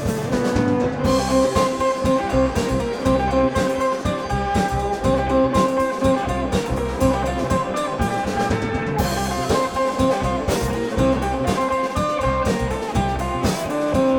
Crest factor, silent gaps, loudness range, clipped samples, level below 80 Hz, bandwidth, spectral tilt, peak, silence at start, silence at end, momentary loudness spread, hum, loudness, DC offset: 16 dB; none; 2 LU; under 0.1%; -32 dBFS; 18 kHz; -6 dB/octave; -4 dBFS; 0 s; 0 s; 4 LU; none; -21 LUFS; under 0.1%